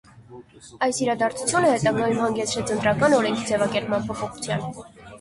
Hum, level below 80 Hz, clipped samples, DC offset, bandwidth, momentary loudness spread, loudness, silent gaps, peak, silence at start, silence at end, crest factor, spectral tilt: none; -54 dBFS; under 0.1%; under 0.1%; 11.5 kHz; 10 LU; -23 LUFS; none; -6 dBFS; 0.15 s; 0 s; 18 dB; -4.5 dB/octave